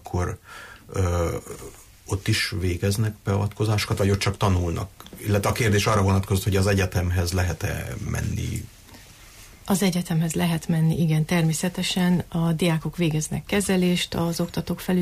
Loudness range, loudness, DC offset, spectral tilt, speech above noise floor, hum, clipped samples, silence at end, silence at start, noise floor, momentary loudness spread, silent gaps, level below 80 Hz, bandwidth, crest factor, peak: 4 LU; -24 LUFS; under 0.1%; -5.5 dB/octave; 23 dB; none; under 0.1%; 0 s; 0.05 s; -47 dBFS; 11 LU; none; -42 dBFS; 15.5 kHz; 14 dB; -10 dBFS